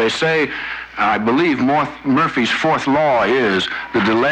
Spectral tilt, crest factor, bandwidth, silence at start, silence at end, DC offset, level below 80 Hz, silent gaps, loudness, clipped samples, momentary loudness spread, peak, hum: -5 dB/octave; 10 dB; 9.4 kHz; 0 s; 0 s; under 0.1%; -50 dBFS; none; -16 LUFS; under 0.1%; 5 LU; -6 dBFS; none